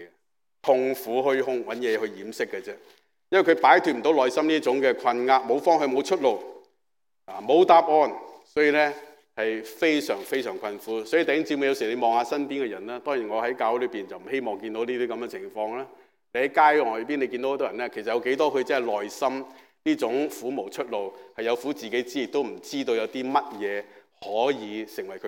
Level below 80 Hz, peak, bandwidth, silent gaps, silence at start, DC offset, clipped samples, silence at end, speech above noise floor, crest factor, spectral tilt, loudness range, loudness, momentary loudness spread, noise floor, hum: -80 dBFS; -4 dBFS; 17 kHz; none; 0 s; under 0.1%; under 0.1%; 0 s; 61 dB; 22 dB; -4 dB/octave; 7 LU; -25 LUFS; 14 LU; -85 dBFS; none